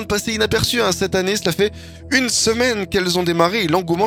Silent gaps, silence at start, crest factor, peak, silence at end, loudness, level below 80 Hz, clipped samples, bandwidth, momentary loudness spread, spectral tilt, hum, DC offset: none; 0 s; 18 dB; 0 dBFS; 0 s; -17 LUFS; -42 dBFS; under 0.1%; 19 kHz; 4 LU; -3.5 dB/octave; none; under 0.1%